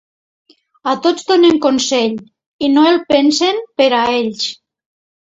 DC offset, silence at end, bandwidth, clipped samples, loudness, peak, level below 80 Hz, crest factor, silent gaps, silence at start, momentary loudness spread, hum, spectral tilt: under 0.1%; 0.85 s; 8 kHz; under 0.1%; -14 LUFS; 0 dBFS; -56 dBFS; 14 dB; 2.46-2.59 s; 0.85 s; 10 LU; none; -3 dB/octave